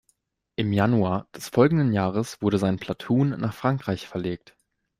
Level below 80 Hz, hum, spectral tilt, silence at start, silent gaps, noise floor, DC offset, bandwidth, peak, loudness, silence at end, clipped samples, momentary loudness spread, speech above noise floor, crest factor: -56 dBFS; none; -7 dB/octave; 0.6 s; none; -70 dBFS; under 0.1%; 15.5 kHz; -6 dBFS; -24 LUFS; 0.65 s; under 0.1%; 10 LU; 47 dB; 18 dB